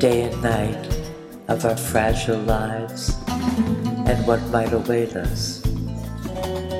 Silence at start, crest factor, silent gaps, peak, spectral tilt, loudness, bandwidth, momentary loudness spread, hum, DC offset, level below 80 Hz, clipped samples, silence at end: 0 s; 18 dB; none; -4 dBFS; -5.5 dB/octave; -23 LUFS; 16 kHz; 8 LU; none; under 0.1%; -32 dBFS; under 0.1%; 0 s